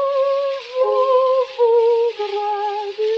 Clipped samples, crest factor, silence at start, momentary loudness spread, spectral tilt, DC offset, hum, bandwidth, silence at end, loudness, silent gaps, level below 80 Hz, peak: under 0.1%; 10 dB; 0 s; 7 LU; -2 dB/octave; under 0.1%; none; 7 kHz; 0 s; -18 LUFS; none; -74 dBFS; -6 dBFS